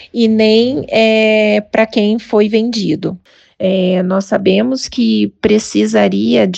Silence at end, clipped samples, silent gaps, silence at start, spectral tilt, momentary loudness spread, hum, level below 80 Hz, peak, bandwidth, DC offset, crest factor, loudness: 0 s; under 0.1%; none; 0 s; -5.5 dB/octave; 6 LU; none; -50 dBFS; 0 dBFS; 8.6 kHz; under 0.1%; 12 dB; -13 LUFS